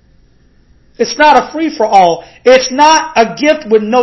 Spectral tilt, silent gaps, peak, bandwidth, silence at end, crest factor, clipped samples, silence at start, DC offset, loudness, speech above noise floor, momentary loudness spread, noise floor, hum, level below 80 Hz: -3 dB/octave; none; 0 dBFS; 8 kHz; 0 s; 10 dB; 0.9%; 1 s; under 0.1%; -10 LUFS; 38 dB; 7 LU; -47 dBFS; none; -48 dBFS